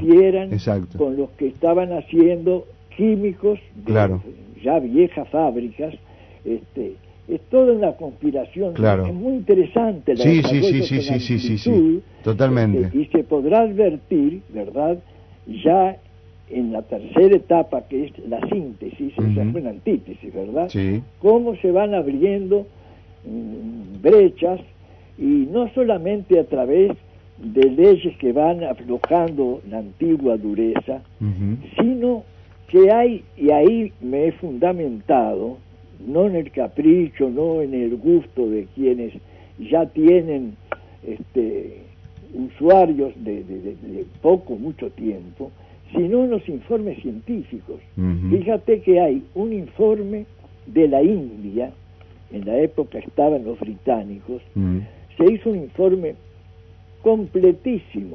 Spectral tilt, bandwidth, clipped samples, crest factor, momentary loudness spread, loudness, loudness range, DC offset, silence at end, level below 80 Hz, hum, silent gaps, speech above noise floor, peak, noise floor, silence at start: -9 dB/octave; 6.2 kHz; under 0.1%; 16 dB; 16 LU; -19 LUFS; 5 LU; under 0.1%; 0 s; -48 dBFS; 50 Hz at -50 dBFS; none; 27 dB; -2 dBFS; -45 dBFS; 0 s